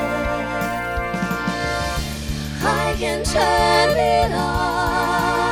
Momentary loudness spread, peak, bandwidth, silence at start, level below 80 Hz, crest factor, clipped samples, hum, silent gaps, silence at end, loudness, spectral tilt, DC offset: 8 LU; -4 dBFS; over 20 kHz; 0 s; -32 dBFS; 16 dB; under 0.1%; none; none; 0 s; -20 LUFS; -4.5 dB/octave; under 0.1%